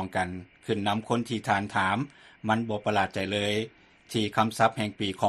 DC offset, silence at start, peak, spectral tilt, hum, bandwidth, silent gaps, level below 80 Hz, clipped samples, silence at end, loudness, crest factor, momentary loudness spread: under 0.1%; 0 s; -8 dBFS; -5 dB/octave; none; 13 kHz; none; -62 dBFS; under 0.1%; 0 s; -28 LUFS; 20 dB; 8 LU